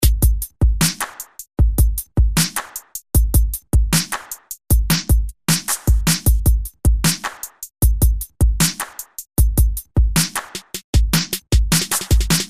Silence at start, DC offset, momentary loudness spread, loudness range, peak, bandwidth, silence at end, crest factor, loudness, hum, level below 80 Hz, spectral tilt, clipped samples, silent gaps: 0 s; 1%; 12 LU; 1 LU; -2 dBFS; 16 kHz; 0 s; 16 dB; -18 LUFS; none; -20 dBFS; -3.5 dB/octave; under 0.1%; 10.84-10.93 s